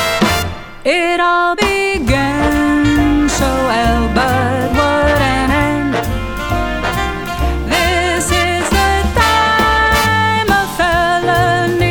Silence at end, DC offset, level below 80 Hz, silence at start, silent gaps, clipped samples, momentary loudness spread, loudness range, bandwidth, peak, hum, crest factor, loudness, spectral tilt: 0 s; under 0.1%; -24 dBFS; 0 s; none; under 0.1%; 7 LU; 3 LU; over 20 kHz; 0 dBFS; none; 14 dB; -13 LUFS; -4.5 dB/octave